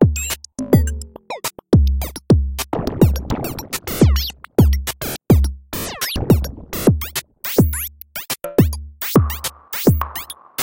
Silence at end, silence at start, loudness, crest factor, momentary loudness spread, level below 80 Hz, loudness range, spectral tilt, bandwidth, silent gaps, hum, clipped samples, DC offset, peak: 0 s; 0 s; -19 LUFS; 18 dB; 11 LU; -24 dBFS; 1 LU; -6 dB/octave; 17 kHz; none; none; under 0.1%; under 0.1%; 0 dBFS